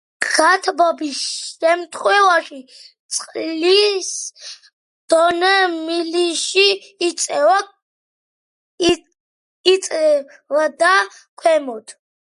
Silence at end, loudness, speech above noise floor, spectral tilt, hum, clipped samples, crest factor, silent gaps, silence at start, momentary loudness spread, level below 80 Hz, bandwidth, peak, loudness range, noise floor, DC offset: 0.4 s; -17 LUFS; over 73 dB; -1 dB/octave; none; under 0.1%; 18 dB; 2.99-3.09 s, 4.73-5.08 s, 7.82-8.78 s, 9.20-9.64 s, 11.29-11.37 s; 0.2 s; 11 LU; -60 dBFS; 11.5 kHz; 0 dBFS; 3 LU; under -90 dBFS; under 0.1%